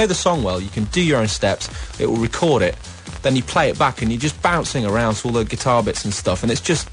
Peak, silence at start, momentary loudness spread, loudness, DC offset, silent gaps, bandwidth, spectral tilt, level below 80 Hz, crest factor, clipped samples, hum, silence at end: -4 dBFS; 0 s; 6 LU; -19 LUFS; under 0.1%; none; 10.5 kHz; -4.5 dB/octave; -36 dBFS; 16 dB; under 0.1%; none; 0 s